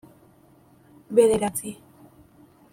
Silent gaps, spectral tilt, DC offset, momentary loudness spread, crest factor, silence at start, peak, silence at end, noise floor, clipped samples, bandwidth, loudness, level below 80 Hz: none; -4.5 dB/octave; under 0.1%; 20 LU; 22 dB; 1.1 s; -6 dBFS; 1 s; -56 dBFS; under 0.1%; 16 kHz; -22 LUFS; -60 dBFS